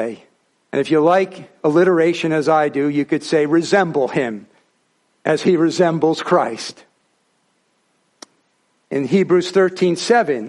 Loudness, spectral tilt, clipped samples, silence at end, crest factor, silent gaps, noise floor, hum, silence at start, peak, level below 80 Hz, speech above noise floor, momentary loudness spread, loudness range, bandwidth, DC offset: -17 LUFS; -5.5 dB/octave; under 0.1%; 0 s; 16 dB; none; -64 dBFS; none; 0 s; -2 dBFS; -66 dBFS; 48 dB; 11 LU; 6 LU; 11.5 kHz; under 0.1%